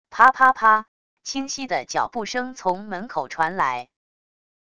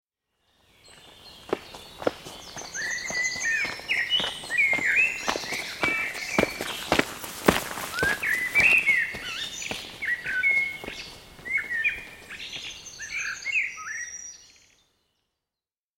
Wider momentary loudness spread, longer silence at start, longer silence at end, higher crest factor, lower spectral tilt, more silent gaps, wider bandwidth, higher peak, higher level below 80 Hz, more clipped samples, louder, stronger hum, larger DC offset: second, 14 LU vs 17 LU; second, 0.1 s vs 0.85 s; second, 0.8 s vs 1.5 s; second, 22 dB vs 28 dB; about the same, -2.5 dB/octave vs -2 dB/octave; first, 0.88-1.17 s vs none; second, 11 kHz vs 17 kHz; about the same, 0 dBFS vs -2 dBFS; second, -62 dBFS vs -54 dBFS; neither; first, -21 LUFS vs -25 LUFS; neither; first, 0.4% vs under 0.1%